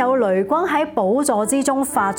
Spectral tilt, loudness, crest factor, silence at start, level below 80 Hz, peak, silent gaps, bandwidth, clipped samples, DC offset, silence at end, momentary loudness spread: -4.5 dB/octave; -18 LUFS; 14 dB; 0 s; -58 dBFS; -4 dBFS; none; 17.5 kHz; under 0.1%; under 0.1%; 0 s; 1 LU